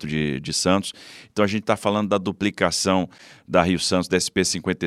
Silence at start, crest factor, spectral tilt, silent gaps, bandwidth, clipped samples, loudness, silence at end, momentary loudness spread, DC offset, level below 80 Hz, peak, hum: 0 s; 22 dB; -4 dB/octave; none; 14.5 kHz; under 0.1%; -22 LUFS; 0 s; 5 LU; under 0.1%; -50 dBFS; -2 dBFS; none